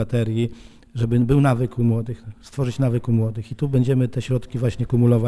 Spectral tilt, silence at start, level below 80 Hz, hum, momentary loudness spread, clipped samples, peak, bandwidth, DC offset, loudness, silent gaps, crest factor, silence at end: -8.5 dB/octave; 0 s; -42 dBFS; none; 10 LU; under 0.1%; -4 dBFS; 11 kHz; under 0.1%; -21 LUFS; none; 16 dB; 0 s